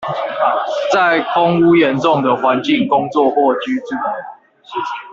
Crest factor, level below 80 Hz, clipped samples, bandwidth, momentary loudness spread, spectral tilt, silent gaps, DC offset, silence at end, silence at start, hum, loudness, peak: 14 dB; -58 dBFS; under 0.1%; 7.6 kHz; 12 LU; -6 dB/octave; none; under 0.1%; 0 s; 0 s; none; -15 LUFS; 0 dBFS